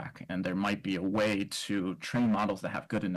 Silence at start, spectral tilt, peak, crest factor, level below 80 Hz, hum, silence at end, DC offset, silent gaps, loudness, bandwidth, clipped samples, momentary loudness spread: 0 s; -5.5 dB/octave; -22 dBFS; 10 dB; -64 dBFS; none; 0 s; under 0.1%; none; -32 LUFS; 13 kHz; under 0.1%; 6 LU